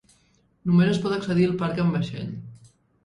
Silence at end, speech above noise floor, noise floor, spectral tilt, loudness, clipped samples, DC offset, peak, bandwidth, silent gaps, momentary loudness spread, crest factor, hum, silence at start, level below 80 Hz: 0.5 s; 41 dB; -63 dBFS; -8 dB/octave; -24 LUFS; under 0.1%; under 0.1%; -10 dBFS; 10.5 kHz; none; 14 LU; 14 dB; none; 0.65 s; -56 dBFS